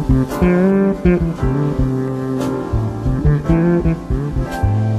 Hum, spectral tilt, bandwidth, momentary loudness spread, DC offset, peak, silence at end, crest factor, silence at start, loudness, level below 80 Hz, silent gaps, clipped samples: none; -9 dB/octave; 13.5 kHz; 6 LU; under 0.1%; -2 dBFS; 0 s; 14 dB; 0 s; -17 LUFS; -24 dBFS; none; under 0.1%